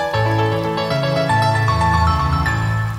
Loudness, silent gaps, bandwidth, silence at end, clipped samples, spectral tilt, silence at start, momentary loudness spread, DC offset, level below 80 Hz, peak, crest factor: -17 LUFS; none; 15 kHz; 0 s; under 0.1%; -6 dB/octave; 0 s; 4 LU; under 0.1%; -30 dBFS; -4 dBFS; 14 dB